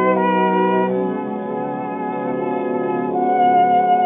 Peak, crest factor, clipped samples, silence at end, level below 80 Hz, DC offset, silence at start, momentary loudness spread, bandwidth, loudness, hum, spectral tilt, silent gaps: -4 dBFS; 12 dB; under 0.1%; 0 s; -66 dBFS; under 0.1%; 0 s; 10 LU; 3.8 kHz; -19 LUFS; none; -5.5 dB/octave; none